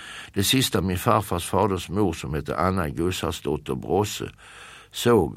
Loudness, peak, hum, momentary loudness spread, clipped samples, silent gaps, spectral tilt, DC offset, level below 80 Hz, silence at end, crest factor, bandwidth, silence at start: -24 LUFS; -4 dBFS; none; 13 LU; under 0.1%; none; -5 dB/octave; under 0.1%; -44 dBFS; 0 s; 22 dB; 16 kHz; 0 s